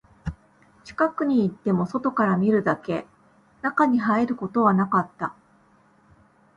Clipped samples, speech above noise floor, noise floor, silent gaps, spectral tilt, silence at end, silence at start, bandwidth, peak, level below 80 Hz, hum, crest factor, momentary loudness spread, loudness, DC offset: under 0.1%; 36 dB; -59 dBFS; none; -8.5 dB/octave; 1.25 s; 0.25 s; 7.8 kHz; -6 dBFS; -52 dBFS; none; 18 dB; 13 LU; -23 LUFS; under 0.1%